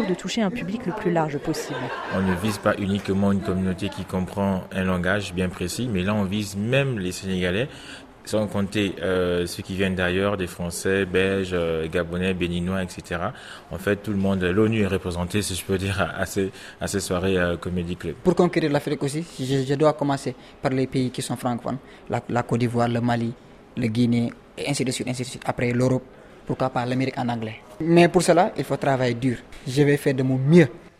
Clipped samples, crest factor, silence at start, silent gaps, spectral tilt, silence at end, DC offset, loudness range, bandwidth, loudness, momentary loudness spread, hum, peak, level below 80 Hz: under 0.1%; 20 dB; 0 s; none; -6 dB/octave; 0.1 s; under 0.1%; 4 LU; 15 kHz; -24 LUFS; 9 LU; none; -4 dBFS; -52 dBFS